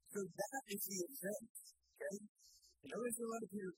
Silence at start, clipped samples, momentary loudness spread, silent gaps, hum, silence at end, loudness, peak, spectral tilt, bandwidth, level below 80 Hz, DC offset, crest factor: 0.05 s; under 0.1%; 19 LU; 1.50-1.55 s, 2.29-2.35 s; none; 0.05 s; -46 LUFS; -30 dBFS; -3.5 dB/octave; 16 kHz; -88 dBFS; under 0.1%; 18 dB